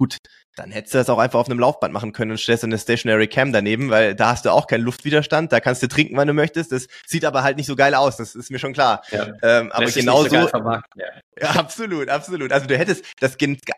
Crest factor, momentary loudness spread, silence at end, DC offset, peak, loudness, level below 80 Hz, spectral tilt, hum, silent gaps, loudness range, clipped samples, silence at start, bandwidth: 18 dB; 11 LU; 0 s; under 0.1%; -2 dBFS; -19 LUFS; -56 dBFS; -5 dB/octave; none; 0.19-0.24 s, 0.44-0.53 s, 11.23-11.32 s, 13.13-13.17 s; 2 LU; under 0.1%; 0 s; 15 kHz